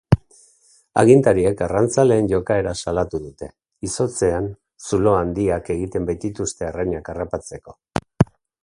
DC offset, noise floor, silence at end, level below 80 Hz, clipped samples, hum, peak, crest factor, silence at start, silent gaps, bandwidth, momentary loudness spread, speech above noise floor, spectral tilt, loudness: under 0.1%; -56 dBFS; 0.4 s; -40 dBFS; under 0.1%; none; 0 dBFS; 20 dB; 0.1 s; none; 11.5 kHz; 14 LU; 37 dB; -6.5 dB/octave; -20 LUFS